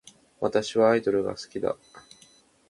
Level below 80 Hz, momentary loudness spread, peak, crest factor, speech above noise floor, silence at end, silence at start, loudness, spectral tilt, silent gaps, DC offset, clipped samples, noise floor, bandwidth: -62 dBFS; 10 LU; -8 dBFS; 20 dB; 33 dB; 0.7 s; 0.4 s; -26 LUFS; -5 dB/octave; none; under 0.1%; under 0.1%; -58 dBFS; 11.5 kHz